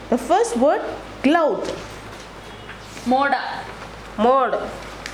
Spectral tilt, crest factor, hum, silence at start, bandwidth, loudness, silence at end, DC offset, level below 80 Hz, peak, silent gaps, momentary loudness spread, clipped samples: -4.5 dB/octave; 18 dB; none; 0 s; 15 kHz; -20 LUFS; 0 s; under 0.1%; -46 dBFS; -4 dBFS; none; 19 LU; under 0.1%